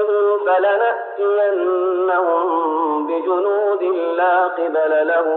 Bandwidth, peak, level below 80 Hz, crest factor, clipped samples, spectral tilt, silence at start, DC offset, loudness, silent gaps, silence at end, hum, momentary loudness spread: 4.1 kHz; -8 dBFS; under -90 dBFS; 10 dB; under 0.1%; 0.5 dB/octave; 0 s; under 0.1%; -18 LUFS; none; 0 s; none; 4 LU